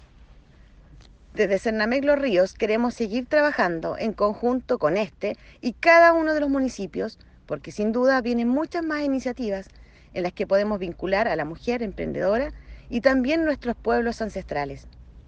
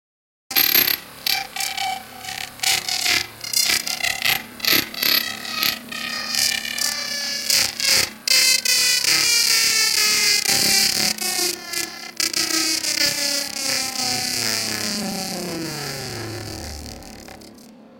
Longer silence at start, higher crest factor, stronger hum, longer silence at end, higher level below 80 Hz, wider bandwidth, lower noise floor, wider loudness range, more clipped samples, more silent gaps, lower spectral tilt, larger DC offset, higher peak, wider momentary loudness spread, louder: first, 1 s vs 0.5 s; about the same, 20 dB vs 22 dB; neither; about the same, 0.05 s vs 0 s; about the same, -48 dBFS vs -52 dBFS; second, 8.8 kHz vs 17 kHz; first, -51 dBFS vs -44 dBFS; second, 5 LU vs 8 LU; neither; neither; first, -6 dB/octave vs 0 dB/octave; neither; second, -4 dBFS vs 0 dBFS; second, 11 LU vs 14 LU; second, -23 LUFS vs -18 LUFS